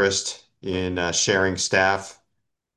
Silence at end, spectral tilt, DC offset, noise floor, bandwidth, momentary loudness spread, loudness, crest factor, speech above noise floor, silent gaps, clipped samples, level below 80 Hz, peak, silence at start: 0.65 s; -2.5 dB/octave; under 0.1%; -78 dBFS; 12.5 kHz; 12 LU; -22 LUFS; 20 dB; 55 dB; none; under 0.1%; -46 dBFS; -4 dBFS; 0 s